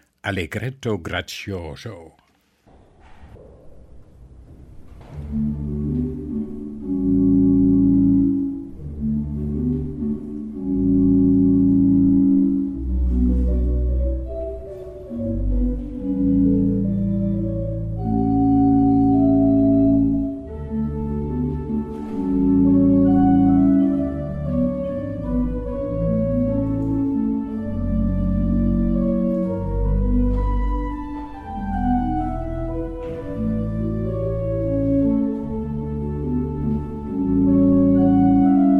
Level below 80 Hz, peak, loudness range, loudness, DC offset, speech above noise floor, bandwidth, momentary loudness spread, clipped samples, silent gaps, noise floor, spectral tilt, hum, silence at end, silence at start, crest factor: -30 dBFS; -6 dBFS; 8 LU; -20 LUFS; under 0.1%; 30 dB; 6.4 kHz; 13 LU; under 0.1%; none; -58 dBFS; -9.5 dB/octave; none; 0 s; 0.25 s; 14 dB